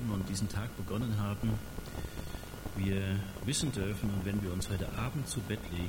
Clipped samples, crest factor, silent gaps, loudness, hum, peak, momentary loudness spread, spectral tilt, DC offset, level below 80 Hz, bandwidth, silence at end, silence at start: under 0.1%; 16 dB; none; -36 LUFS; none; -20 dBFS; 9 LU; -5.5 dB/octave; under 0.1%; -46 dBFS; 19 kHz; 0 s; 0 s